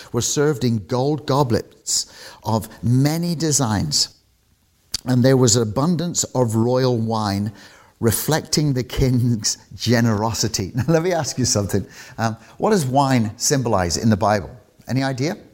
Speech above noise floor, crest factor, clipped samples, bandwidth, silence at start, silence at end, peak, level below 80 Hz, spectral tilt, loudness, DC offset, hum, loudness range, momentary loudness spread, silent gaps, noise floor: 41 dB; 16 dB; under 0.1%; 16.5 kHz; 0 s; 0.1 s; -4 dBFS; -44 dBFS; -4.5 dB/octave; -20 LUFS; under 0.1%; none; 2 LU; 7 LU; none; -60 dBFS